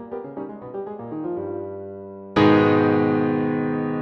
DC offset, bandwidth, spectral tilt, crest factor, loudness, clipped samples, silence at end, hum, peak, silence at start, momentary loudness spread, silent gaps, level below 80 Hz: under 0.1%; 6.4 kHz; -8.5 dB/octave; 18 dB; -21 LUFS; under 0.1%; 0 s; none; -4 dBFS; 0 s; 18 LU; none; -58 dBFS